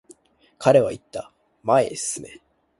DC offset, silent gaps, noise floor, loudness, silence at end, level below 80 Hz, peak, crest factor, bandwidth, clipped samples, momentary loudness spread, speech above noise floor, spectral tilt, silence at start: under 0.1%; none; -53 dBFS; -21 LUFS; 0.55 s; -60 dBFS; -2 dBFS; 22 dB; 11.5 kHz; under 0.1%; 18 LU; 33 dB; -4.5 dB/octave; 0.6 s